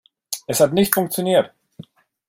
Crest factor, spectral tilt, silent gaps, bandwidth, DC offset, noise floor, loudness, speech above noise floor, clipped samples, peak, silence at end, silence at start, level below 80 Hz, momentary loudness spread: 20 dB; -4 dB/octave; none; 16.5 kHz; under 0.1%; -43 dBFS; -19 LUFS; 26 dB; under 0.1%; 0 dBFS; 0.45 s; 0.3 s; -58 dBFS; 14 LU